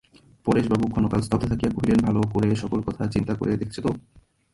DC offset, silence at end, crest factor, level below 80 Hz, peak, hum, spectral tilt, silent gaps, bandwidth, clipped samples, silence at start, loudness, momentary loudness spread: under 0.1%; 0.55 s; 16 dB; -42 dBFS; -8 dBFS; none; -8 dB/octave; none; 11.5 kHz; under 0.1%; 0.45 s; -24 LUFS; 7 LU